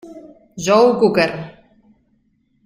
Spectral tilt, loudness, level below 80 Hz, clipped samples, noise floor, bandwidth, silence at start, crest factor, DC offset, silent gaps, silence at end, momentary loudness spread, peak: -5 dB/octave; -15 LUFS; -56 dBFS; under 0.1%; -62 dBFS; 15.5 kHz; 0.05 s; 18 dB; under 0.1%; none; 1.15 s; 23 LU; -2 dBFS